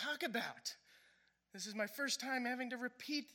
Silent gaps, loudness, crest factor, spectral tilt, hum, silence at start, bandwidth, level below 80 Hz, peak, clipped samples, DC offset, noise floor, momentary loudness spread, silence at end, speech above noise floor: none; -42 LUFS; 18 dB; -2 dB/octave; none; 0 s; 17 kHz; under -90 dBFS; -26 dBFS; under 0.1%; under 0.1%; -74 dBFS; 10 LU; 0 s; 31 dB